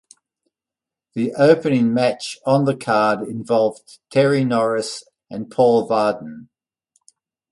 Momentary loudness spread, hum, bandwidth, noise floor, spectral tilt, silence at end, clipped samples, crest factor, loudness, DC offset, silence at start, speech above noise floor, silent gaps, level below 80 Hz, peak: 15 LU; none; 11.5 kHz; -88 dBFS; -6 dB/octave; 1.1 s; under 0.1%; 18 dB; -18 LUFS; under 0.1%; 1.15 s; 70 dB; none; -64 dBFS; -2 dBFS